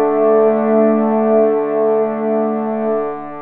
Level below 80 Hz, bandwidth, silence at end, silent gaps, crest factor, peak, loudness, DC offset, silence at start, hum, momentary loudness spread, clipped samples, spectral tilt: -66 dBFS; 3.4 kHz; 0 s; none; 12 dB; -2 dBFS; -15 LUFS; under 0.1%; 0 s; none; 6 LU; under 0.1%; -8 dB/octave